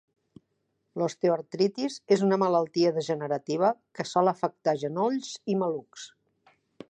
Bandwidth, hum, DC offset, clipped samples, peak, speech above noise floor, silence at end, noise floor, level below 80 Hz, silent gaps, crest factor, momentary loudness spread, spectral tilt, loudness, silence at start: 9.6 kHz; none; under 0.1%; under 0.1%; -10 dBFS; 50 dB; 0.8 s; -77 dBFS; -78 dBFS; none; 18 dB; 10 LU; -6 dB/octave; -27 LUFS; 0.95 s